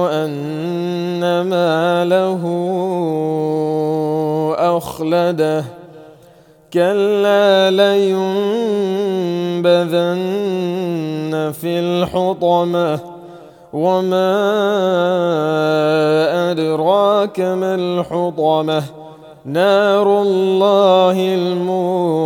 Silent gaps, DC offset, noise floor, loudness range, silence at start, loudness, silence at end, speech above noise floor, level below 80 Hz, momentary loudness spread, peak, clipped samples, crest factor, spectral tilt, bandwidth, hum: none; under 0.1%; -46 dBFS; 4 LU; 0 s; -16 LUFS; 0 s; 31 dB; -58 dBFS; 8 LU; 0 dBFS; under 0.1%; 16 dB; -6.5 dB/octave; 18 kHz; none